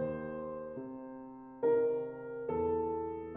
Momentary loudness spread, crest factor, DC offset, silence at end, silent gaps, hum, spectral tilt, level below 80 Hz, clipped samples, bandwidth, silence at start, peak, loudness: 16 LU; 14 dB; under 0.1%; 0 s; none; none; -8.5 dB/octave; -62 dBFS; under 0.1%; 3.5 kHz; 0 s; -22 dBFS; -36 LUFS